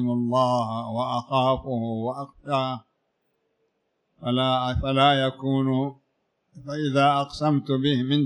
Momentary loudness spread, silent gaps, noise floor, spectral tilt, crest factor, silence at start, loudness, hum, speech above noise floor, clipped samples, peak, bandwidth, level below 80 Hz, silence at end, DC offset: 11 LU; none; -74 dBFS; -7 dB/octave; 18 dB; 0 s; -24 LUFS; none; 51 dB; under 0.1%; -6 dBFS; 10.5 kHz; -48 dBFS; 0 s; under 0.1%